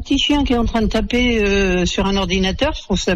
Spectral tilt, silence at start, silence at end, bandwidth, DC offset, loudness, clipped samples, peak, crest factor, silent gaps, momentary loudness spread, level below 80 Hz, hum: -4.5 dB/octave; 0 s; 0 s; 10.5 kHz; under 0.1%; -17 LUFS; under 0.1%; -6 dBFS; 10 dB; none; 3 LU; -26 dBFS; none